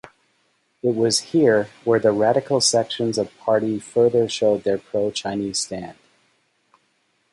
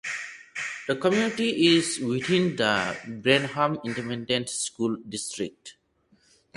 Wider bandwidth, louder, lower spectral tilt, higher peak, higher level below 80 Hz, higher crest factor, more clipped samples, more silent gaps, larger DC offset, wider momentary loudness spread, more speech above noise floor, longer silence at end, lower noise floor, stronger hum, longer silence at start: about the same, 11.5 kHz vs 11.5 kHz; first, -20 LUFS vs -26 LUFS; about the same, -4 dB/octave vs -4 dB/octave; about the same, -4 dBFS vs -6 dBFS; about the same, -62 dBFS vs -64 dBFS; about the same, 18 dB vs 22 dB; neither; neither; neither; second, 8 LU vs 11 LU; first, 47 dB vs 39 dB; first, 1.4 s vs 0.85 s; about the same, -67 dBFS vs -64 dBFS; neither; first, 0.85 s vs 0.05 s